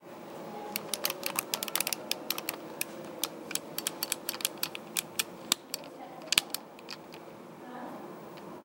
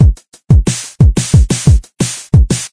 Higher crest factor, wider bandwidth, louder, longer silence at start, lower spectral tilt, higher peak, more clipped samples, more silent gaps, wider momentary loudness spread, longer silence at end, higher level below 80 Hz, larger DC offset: first, 36 dB vs 10 dB; first, 17 kHz vs 11 kHz; second, -33 LUFS vs -12 LUFS; about the same, 0 s vs 0 s; second, -0.5 dB/octave vs -5.5 dB/octave; about the same, 0 dBFS vs 0 dBFS; second, under 0.1% vs 0.5%; second, none vs 0.28-0.32 s; first, 15 LU vs 8 LU; about the same, 0 s vs 0.05 s; second, -80 dBFS vs -14 dBFS; neither